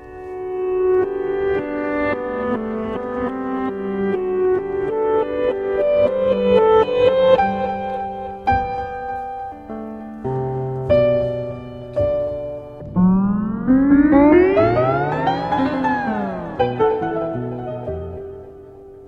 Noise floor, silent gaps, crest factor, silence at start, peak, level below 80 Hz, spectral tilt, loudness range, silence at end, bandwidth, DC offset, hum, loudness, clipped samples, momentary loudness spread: -39 dBFS; none; 18 dB; 0 s; 0 dBFS; -42 dBFS; -9 dB/octave; 7 LU; 0 s; 6.6 kHz; under 0.1%; none; -19 LUFS; under 0.1%; 15 LU